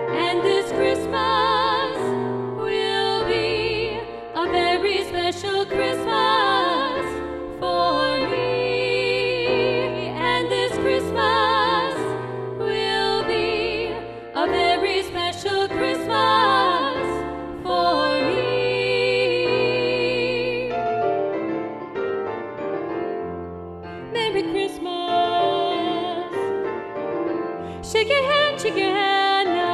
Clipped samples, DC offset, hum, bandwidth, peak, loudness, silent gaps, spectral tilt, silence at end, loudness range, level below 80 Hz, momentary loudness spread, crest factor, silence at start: under 0.1%; under 0.1%; none; 13 kHz; -6 dBFS; -22 LUFS; none; -4.5 dB/octave; 0 s; 4 LU; -50 dBFS; 10 LU; 16 dB; 0 s